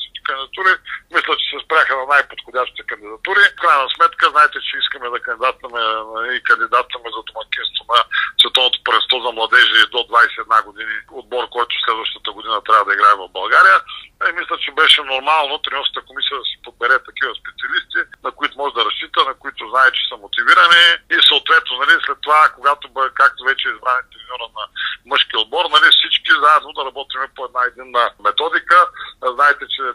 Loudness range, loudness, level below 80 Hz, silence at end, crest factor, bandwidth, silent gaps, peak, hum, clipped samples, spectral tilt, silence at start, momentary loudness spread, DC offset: 6 LU; -14 LUFS; -58 dBFS; 0 s; 16 dB; 13 kHz; none; 0 dBFS; none; under 0.1%; 0 dB/octave; 0 s; 14 LU; under 0.1%